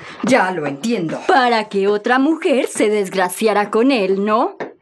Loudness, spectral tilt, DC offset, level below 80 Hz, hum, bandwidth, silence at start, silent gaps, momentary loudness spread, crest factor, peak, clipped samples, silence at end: -16 LUFS; -4.5 dB/octave; under 0.1%; -70 dBFS; none; 13.5 kHz; 0 s; none; 6 LU; 16 dB; -2 dBFS; under 0.1%; 0.1 s